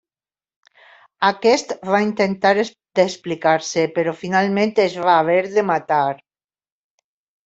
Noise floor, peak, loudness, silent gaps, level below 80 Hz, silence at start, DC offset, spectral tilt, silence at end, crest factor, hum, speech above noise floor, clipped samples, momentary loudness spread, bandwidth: under -90 dBFS; -2 dBFS; -18 LUFS; none; -66 dBFS; 1.2 s; under 0.1%; -4.5 dB/octave; 1.3 s; 18 dB; none; over 72 dB; under 0.1%; 5 LU; 8.2 kHz